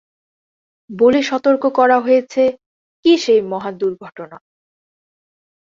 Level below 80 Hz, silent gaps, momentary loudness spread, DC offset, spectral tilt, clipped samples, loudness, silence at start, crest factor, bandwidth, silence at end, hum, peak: -62 dBFS; 2.66-3.03 s; 20 LU; under 0.1%; -4.5 dB/octave; under 0.1%; -15 LUFS; 0.9 s; 16 dB; 7.6 kHz; 1.4 s; none; -2 dBFS